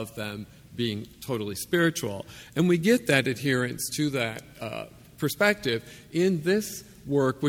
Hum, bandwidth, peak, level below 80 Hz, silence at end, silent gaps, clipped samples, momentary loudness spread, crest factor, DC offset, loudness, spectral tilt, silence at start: none; 18 kHz; -6 dBFS; -58 dBFS; 0 s; none; under 0.1%; 14 LU; 22 dB; under 0.1%; -27 LUFS; -5 dB/octave; 0 s